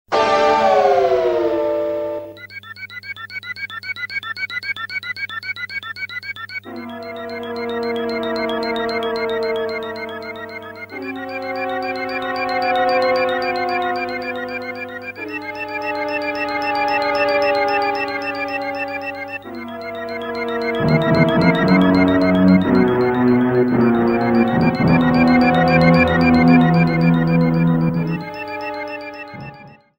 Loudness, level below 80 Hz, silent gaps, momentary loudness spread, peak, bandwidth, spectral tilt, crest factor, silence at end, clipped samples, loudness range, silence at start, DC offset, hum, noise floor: -18 LUFS; -44 dBFS; none; 16 LU; 0 dBFS; 16.5 kHz; -7.5 dB/octave; 18 dB; 0.25 s; under 0.1%; 11 LU; 0.1 s; under 0.1%; none; -40 dBFS